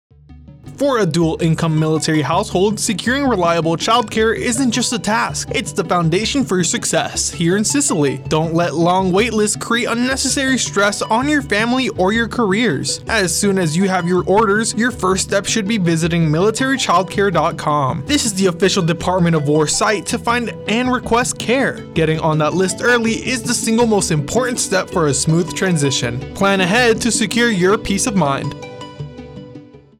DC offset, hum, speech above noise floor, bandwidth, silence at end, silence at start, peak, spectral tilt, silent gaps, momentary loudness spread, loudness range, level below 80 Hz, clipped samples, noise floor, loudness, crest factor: under 0.1%; none; 24 dB; 16 kHz; 0.2 s; 0.3 s; -4 dBFS; -4 dB/octave; none; 4 LU; 1 LU; -42 dBFS; under 0.1%; -40 dBFS; -16 LUFS; 12 dB